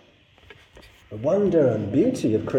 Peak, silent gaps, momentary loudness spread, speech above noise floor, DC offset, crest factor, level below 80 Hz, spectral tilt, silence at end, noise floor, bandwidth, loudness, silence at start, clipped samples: -8 dBFS; none; 8 LU; 34 dB; under 0.1%; 16 dB; -56 dBFS; -8 dB/octave; 0 s; -54 dBFS; 12.5 kHz; -22 LUFS; 1.1 s; under 0.1%